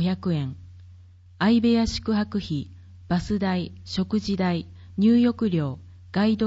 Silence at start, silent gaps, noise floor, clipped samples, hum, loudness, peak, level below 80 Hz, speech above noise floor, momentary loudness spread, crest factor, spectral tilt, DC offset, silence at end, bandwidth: 0 s; none; -49 dBFS; under 0.1%; none; -24 LUFS; -10 dBFS; -48 dBFS; 26 dB; 12 LU; 14 dB; -7 dB/octave; under 0.1%; 0 s; 8 kHz